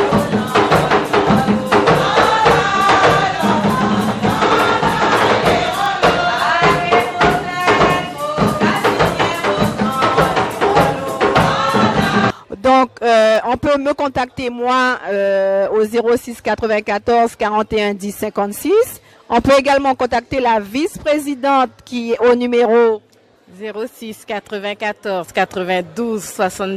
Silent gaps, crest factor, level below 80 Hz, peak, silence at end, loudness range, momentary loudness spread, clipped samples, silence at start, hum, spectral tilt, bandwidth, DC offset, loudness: none; 14 dB; -40 dBFS; 0 dBFS; 0 s; 4 LU; 9 LU; under 0.1%; 0 s; none; -5 dB/octave; 15 kHz; under 0.1%; -15 LUFS